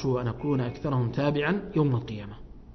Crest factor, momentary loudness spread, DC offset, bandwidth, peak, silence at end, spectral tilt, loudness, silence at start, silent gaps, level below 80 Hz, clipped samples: 16 dB; 13 LU; under 0.1%; 6.2 kHz; -12 dBFS; 0.05 s; -8.5 dB/octave; -28 LUFS; 0 s; none; -48 dBFS; under 0.1%